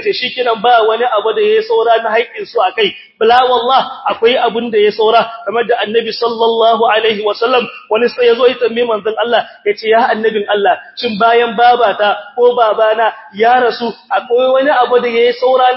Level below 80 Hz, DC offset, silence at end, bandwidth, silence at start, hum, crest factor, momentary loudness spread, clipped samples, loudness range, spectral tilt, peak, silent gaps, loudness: -60 dBFS; under 0.1%; 0 s; 5.8 kHz; 0 s; none; 12 dB; 6 LU; under 0.1%; 1 LU; -6.5 dB/octave; 0 dBFS; none; -12 LUFS